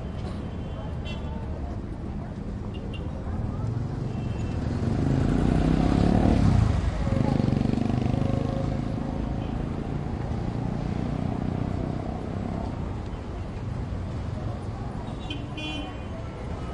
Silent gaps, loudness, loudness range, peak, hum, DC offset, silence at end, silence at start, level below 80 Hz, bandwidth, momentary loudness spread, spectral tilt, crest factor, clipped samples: none; -28 LUFS; 10 LU; -8 dBFS; none; under 0.1%; 0 s; 0 s; -34 dBFS; 11 kHz; 12 LU; -8 dB/octave; 18 dB; under 0.1%